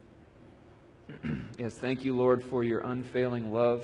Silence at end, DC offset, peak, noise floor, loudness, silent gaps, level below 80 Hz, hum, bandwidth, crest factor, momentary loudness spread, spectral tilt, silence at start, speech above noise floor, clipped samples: 0 s; under 0.1%; -12 dBFS; -56 dBFS; -31 LUFS; none; -60 dBFS; none; 10.5 kHz; 18 dB; 11 LU; -8 dB/octave; 0.45 s; 26 dB; under 0.1%